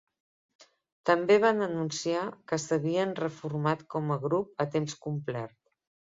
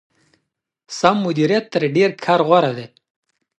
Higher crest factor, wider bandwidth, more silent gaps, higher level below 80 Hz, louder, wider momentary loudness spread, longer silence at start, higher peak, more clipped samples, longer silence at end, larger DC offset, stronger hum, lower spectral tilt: about the same, 22 dB vs 18 dB; second, 7.8 kHz vs 9.2 kHz; first, 0.92-1.04 s vs none; about the same, -72 dBFS vs -68 dBFS; second, -29 LUFS vs -17 LUFS; first, 11 LU vs 8 LU; second, 0.6 s vs 0.9 s; second, -10 dBFS vs 0 dBFS; neither; about the same, 0.65 s vs 0.7 s; neither; neither; about the same, -5.5 dB/octave vs -6 dB/octave